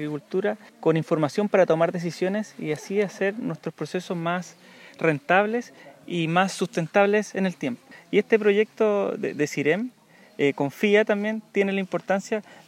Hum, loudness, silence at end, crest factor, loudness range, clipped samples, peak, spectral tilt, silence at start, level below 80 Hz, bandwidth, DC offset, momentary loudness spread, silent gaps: none; -24 LUFS; 0.15 s; 20 dB; 3 LU; under 0.1%; -4 dBFS; -6 dB/octave; 0 s; -82 dBFS; 15.5 kHz; under 0.1%; 11 LU; none